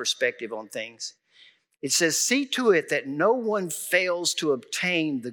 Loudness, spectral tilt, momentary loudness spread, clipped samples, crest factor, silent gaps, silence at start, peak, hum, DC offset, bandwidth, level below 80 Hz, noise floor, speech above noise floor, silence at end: -24 LUFS; -2 dB/octave; 13 LU; under 0.1%; 18 dB; none; 0 s; -8 dBFS; none; under 0.1%; 19.5 kHz; under -90 dBFS; -57 dBFS; 32 dB; 0 s